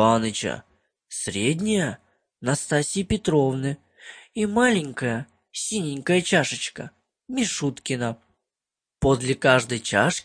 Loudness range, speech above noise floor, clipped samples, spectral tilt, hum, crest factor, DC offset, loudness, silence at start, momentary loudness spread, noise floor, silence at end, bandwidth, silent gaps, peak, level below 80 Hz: 2 LU; 66 dB; under 0.1%; -4.5 dB/octave; none; 24 dB; under 0.1%; -24 LUFS; 0 s; 16 LU; -89 dBFS; 0.05 s; 10.5 kHz; none; -2 dBFS; -48 dBFS